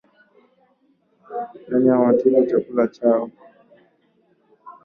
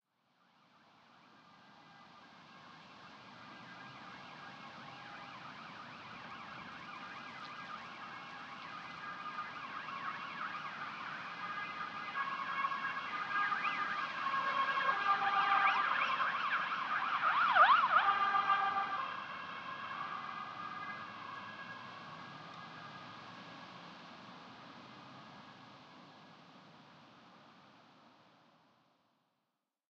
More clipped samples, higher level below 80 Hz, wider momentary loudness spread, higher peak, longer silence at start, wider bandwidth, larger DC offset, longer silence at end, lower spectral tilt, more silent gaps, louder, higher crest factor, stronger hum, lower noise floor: neither; first, -66 dBFS vs -86 dBFS; second, 16 LU vs 23 LU; first, -4 dBFS vs -14 dBFS; about the same, 1.3 s vs 1.25 s; second, 5.2 kHz vs 7.8 kHz; neither; second, 0.15 s vs 1.9 s; first, -10 dB/octave vs -3.5 dB/octave; neither; first, -19 LUFS vs -36 LUFS; second, 18 dB vs 24 dB; neither; second, -62 dBFS vs -87 dBFS